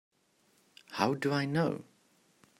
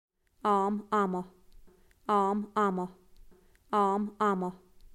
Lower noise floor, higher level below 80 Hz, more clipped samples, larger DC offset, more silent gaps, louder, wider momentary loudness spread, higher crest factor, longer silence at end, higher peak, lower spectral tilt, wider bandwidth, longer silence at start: first, -70 dBFS vs -57 dBFS; second, -76 dBFS vs -62 dBFS; neither; neither; neither; about the same, -32 LUFS vs -30 LUFS; about the same, 12 LU vs 11 LU; first, 24 dB vs 16 dB; first, 0.8 s vs 0.4 s; first, -12 dBFS vs -16 dBFS; about the same, -6 dB/octave vs -7 dB/octave; first, 16 kHz vs 12.5 kHz; first, 0.9 s vs 0.45 s